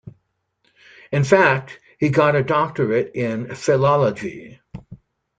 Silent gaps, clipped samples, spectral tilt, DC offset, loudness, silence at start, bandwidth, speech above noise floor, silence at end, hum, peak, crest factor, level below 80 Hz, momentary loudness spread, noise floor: none; under 0.1%; -6.5 dB/octave; under 0.1%; -19 LUFS; 0.05 s; 9.2 kHz; 50 dB; 0.45 s; none; 0 dBFS; 20 dB; -56 dBFS; 24 LU; -69 dBFS